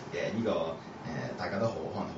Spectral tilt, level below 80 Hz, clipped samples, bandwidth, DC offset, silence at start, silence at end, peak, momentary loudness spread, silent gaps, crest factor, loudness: -5 dB/octave; -62 dBFS; under 0.1%; 7.6 kHz; under 0.1%; 0 s; 0 s; -18 dBFS; 7 LU; none; 16 dB; -34 LUFS